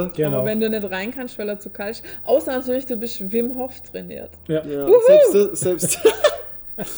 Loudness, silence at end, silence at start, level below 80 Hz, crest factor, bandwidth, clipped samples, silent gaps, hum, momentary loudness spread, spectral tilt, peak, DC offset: -19 LUFS; 0 s; 0 s; -54 dBFS; 18 dB; over 20 kHz; under 0.1%; none; none; 16 LU; -4.5 dB/octave; -2 dBFS; under 0.1%